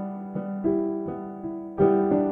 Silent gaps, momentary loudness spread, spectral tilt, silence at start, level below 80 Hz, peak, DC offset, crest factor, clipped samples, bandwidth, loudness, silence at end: none; 13 LU; -12.5 dB/octave; 0 s; -54 dBFS; -8 dBFS; under 0.1%; 16 dB; under 0.1%; 3.4 kHz; -26 LUFS; 0 s